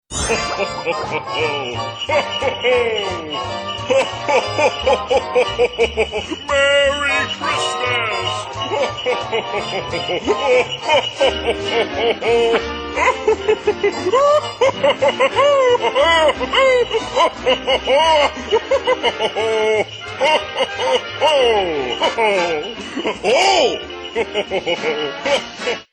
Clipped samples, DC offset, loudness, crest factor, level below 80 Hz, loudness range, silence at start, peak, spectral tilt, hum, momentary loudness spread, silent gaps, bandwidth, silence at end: under 0.1%; under 0.1%; -17 LUFS; 14 dB; -42 dBFS; 4 LU; 0.1 s; -4 dBFS; -3 dB/octave; none; 8 LU; none; 11 kHz; 0.1 s